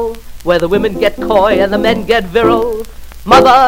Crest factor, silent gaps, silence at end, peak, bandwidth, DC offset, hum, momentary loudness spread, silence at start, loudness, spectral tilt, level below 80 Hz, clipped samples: 10 dB; none; 0 s; 0 dBFS; 16.5 kHz; under 0.1%; none; 14 LU; 0 s; -11 LUFS; -5 dB/octave; -30 dBFS; 0.7%